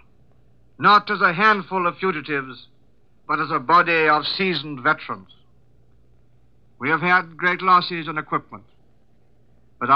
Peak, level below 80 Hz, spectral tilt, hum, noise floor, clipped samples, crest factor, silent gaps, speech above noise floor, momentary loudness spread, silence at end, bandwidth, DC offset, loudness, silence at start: -4 dBFS; -62 dBFS; -6.5 dB/octave; none; -60 dBFS; under 0.1%; 18 dB; none; 40 dB; 12 LU; 0 s; 6.8 kHz; 0.2%; -19 LUFS; 0.8 s